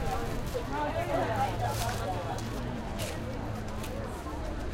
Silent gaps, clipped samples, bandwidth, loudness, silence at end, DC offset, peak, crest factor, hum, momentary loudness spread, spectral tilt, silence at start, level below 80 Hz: none; under 0.1%; 17 kHz; -34 LUFS; 0 s; under 0.1%; -18 dBFS; 14 dB; none; 7 LU; -5.5 dB/octave; 0 s; -40 dBFS